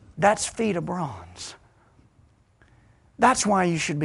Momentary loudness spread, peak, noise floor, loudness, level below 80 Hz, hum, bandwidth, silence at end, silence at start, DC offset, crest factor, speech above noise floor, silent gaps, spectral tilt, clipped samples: 18 LU; -4 dBFS; -59 dBFS; -23 LUFS; -56 dBFS; none; 11.5 kHz; 0 s; 0.15 s; under 0.1%; 22 dB; 36 dB; none; -4 dB/octave; under 0.1%